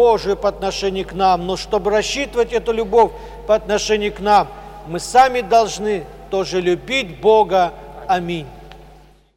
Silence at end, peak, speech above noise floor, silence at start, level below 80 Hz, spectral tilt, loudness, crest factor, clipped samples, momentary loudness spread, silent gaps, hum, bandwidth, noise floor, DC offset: 0.55 s; -2 dBFS; 29 dB; 0 s; -40 dBFS; -4 dB/octave; -18 LUFS; 14 dB; under 0.1%; 12 LU; none; none; 15.5 kHz; -46 dBFS; under 0.1%